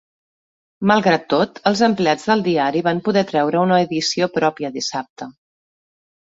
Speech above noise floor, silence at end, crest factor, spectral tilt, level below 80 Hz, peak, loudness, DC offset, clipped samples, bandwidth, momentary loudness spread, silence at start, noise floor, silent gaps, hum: over 72 dB; 1.05 s; 18 dB; -5 dB/octave; -60 dBFS; -2 dBFS; -18 LUFS; under 0.1%; under 0.1%; 8 kHz; 8 LU; 0.8 s; under -90 dBFS; 5.10-5.16 s; none